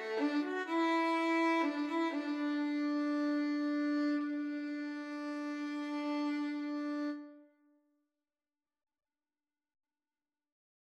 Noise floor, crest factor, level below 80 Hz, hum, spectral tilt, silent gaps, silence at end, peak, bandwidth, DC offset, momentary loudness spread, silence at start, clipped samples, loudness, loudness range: under -90 dBFS; 16 dB; under -90 dBFS; none; -3.5 dB/octave; none; 3.45 s; -22 dBFS; 9 kHz; under 0.1%; 9 LU; 0 s; under 0.1%; -35 LUFS; 10 LU